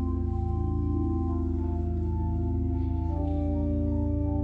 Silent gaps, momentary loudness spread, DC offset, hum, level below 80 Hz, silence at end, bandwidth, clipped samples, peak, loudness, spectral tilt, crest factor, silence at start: none; 2 LU; under 0.1%; none; -32 dBFS; 0 s; 2.5 kHz; under 0.1%; -18 dBFS; -29 LUFS; -12 dB/octave; 10 dB; 0 s